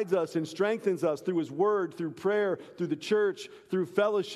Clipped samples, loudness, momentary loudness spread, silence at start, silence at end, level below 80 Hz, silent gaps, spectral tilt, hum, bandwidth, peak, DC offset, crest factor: under 0.1%; -30 LUFS; 7 LU; 0 s; 0 s; -80 dBFS; none; -6 dB/octave; none; 13 kHz; -12 dBFS; under 0.1%; 18 dB